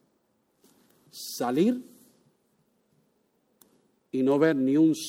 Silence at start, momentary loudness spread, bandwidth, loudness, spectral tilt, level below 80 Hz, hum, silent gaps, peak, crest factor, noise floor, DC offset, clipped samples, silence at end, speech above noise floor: 1.15 s; 16 LU; 16.5 kHz; -25 LUFS; -6 dB/octave; -80 dBFS; none; none; -10 dBFS; 18 dB; -71 dBFS; under 0.1%; under 0.1%; 0 s; 47 dB